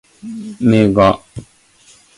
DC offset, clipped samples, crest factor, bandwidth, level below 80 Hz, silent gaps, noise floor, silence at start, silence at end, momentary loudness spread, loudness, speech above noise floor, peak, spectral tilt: under 0.1%; under 0.1%; 16 dB; 11.5 kHz; -42 dBFS; none; -49 dBFS; 0.25 s; 0.75 s; 23 LU; -13 LUFS; 34 dB; 0 dBFS; -7.5 dB/octave